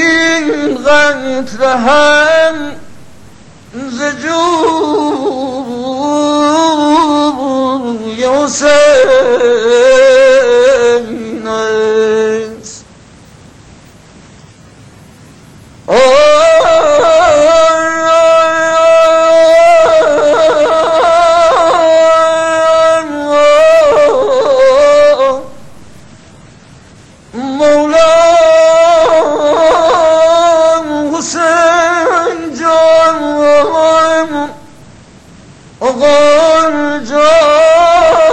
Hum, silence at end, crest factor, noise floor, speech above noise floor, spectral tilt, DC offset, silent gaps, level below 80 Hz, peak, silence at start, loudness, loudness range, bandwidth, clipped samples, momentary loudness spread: none; 0 s; 8 dB; -38 dBFS; 29 dB; -3 dB/octave; under 0.1%; none; -42 dBFS; 0 dBFS; 0 s; -8 LUFS; 6 LU; 9 kHz; under 0.1%; 10 LU